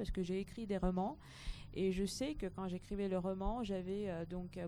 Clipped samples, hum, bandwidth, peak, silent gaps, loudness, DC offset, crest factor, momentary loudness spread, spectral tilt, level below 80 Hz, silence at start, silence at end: under 0.1%; none; 13.5 kHz; -22 dBFS; none; -41 LUFS; under 0.1%; 18 dB; 8 LU; -6.5 dB/octave; -50 dBFS; 0 s; 0 s